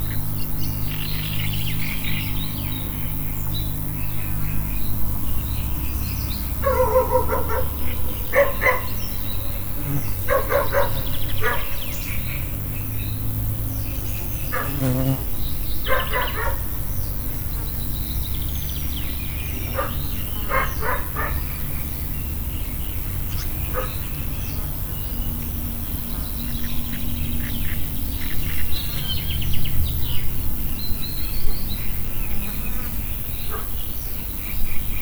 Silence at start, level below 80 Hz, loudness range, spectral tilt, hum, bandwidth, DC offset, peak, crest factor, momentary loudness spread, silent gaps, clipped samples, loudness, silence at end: 0 s; -28 dBFS; 4 LU; -5 dB/octave; none; over 20 kHz; under 0.1%; -4 dBFS; 16 dB; 5 LU; none; under 0.1%; -25 LUFS; 0 s